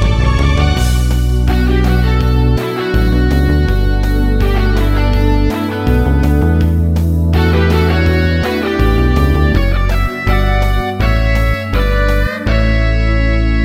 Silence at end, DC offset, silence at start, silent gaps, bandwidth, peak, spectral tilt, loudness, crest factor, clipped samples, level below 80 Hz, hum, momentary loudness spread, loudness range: 0 s; under 0.1%; 0 s; none; 15.5 kHz; 0 dBFS; -7 dB/octave; -13 LUFS; 10 dB; under 0.1%; -14 dBFS; none; 3 LU; 2 LU